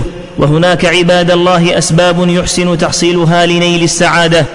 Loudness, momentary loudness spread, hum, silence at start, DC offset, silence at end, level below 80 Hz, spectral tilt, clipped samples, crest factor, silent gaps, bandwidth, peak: -9 LUFS; 3 LU; none; 0 s; under 0.1%; 0 s; -32 dBFS; -4.5 dB/octave; under 0.1%; 8 dB; none; 11 kHz; 0 dBFS